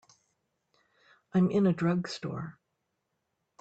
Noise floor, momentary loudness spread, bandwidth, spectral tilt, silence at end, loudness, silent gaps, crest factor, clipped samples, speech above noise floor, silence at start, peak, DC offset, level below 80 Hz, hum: -81 dBFS; 14 LU; 8 kHz; -7.5 dB/octave; 1.1 s; -29 LUFS; none; 16 dB; under 0.1%; 54 dB; 1.35 s; -16 dBFS; under 0.1%; -70 dBFS; none